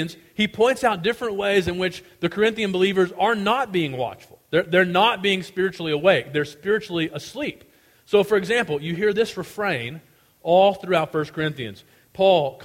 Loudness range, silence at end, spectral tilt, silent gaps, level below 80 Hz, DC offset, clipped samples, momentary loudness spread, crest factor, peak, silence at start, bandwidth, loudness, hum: 3 LU; 0 s; -5 dB/octave; none; -56 dBFS; under 0.1%; under 0.1%; 11 LU; 18 dB; -4 dBFS; 0 s; 16.5 kHz; -22 LUFS; none